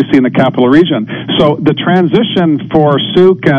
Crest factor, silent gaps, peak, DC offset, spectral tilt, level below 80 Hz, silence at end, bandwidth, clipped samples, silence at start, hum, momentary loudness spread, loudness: 8 dB; none; 0 dBFS; under 0.1%; -8 dB/octave; -42 dBFS; 0 s; 7 kHz; 2%; 0 s; none; 4 LU; -10 LUFS